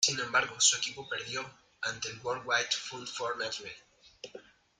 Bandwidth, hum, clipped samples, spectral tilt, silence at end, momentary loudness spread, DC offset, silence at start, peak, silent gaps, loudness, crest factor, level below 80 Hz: 12.5 kHz; none; under 0.1%; 0 dB/octave; 0.4 s; 23 LU; under 0.1%; 0 s; -12 dBFS; none; -31 LUFS; 22 dB; -72 dBFS